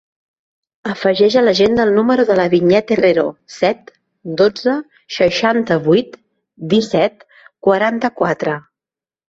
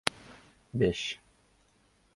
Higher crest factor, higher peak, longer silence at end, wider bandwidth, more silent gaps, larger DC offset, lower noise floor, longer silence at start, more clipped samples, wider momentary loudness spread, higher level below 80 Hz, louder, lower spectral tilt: second, 14 dB vs 34 dB; about the same, -2 dBFS vs 0 dBFS; second, 0.7 s vs 1 s; second, 7.8 kHz vs 11.5 kHz; neither; neither; first, under -90 dBFS vs -67 dBFS; first, 0.85 s vs 0.05 s; neither; second, 14 LU vs 23 LU; about the same, -54 dBFS vs -56 dBFS; first, -15 LUFS vs -32 LUFS; first, -6 dB/octave vs -4.5 dB/octave